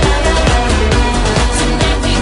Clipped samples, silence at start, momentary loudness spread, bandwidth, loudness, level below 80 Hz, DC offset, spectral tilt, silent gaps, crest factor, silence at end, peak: under 0.1%; 0 s; 1 LU; 11 kHz; -13 LUFS; -16 dBFS; under 0.1%; -4.5 dB/octave; none; 10 dB; 0 s; 0 dBFS